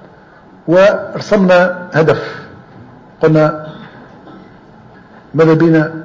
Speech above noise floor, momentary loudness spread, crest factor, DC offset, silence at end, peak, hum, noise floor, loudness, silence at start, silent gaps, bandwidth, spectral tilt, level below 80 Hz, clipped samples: 30 dB; 18 LU; 12 dB; under 0.1%; 0 s; -2 dBFS; none; -41 dBFS; -11 LUFS; 0.65 s; none; 7.6 kHz; -7.5 dB/octave; -50 dBFS; under 0.1%